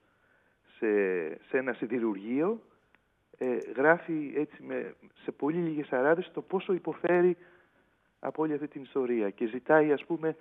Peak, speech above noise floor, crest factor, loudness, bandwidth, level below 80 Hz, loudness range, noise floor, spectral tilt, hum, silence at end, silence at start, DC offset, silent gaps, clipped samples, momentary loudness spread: -10 dBFS; 40 dB; 22 dB; -30 LUFS; 3.9 kHz; -82 dBFS; 2 LU; -69 dBFS; -9 dB/octave; none; 0.05 s; 0.8 s; under 0.1%; none; under 0.1%; 12 LU